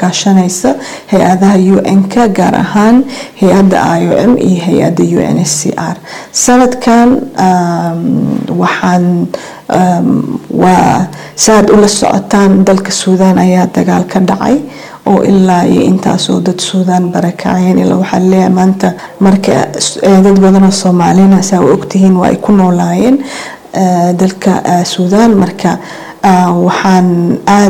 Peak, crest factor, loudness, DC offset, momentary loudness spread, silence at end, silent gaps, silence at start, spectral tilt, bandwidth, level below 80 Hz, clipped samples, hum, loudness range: 0 dBFS; 8 dB; -8 LUFS; under 0.1%; 7 LU; 0 s; none; 0 s; -5.5 dB/octave; 14 kHz; -40 dBFS; 0.3%; none; 3 LU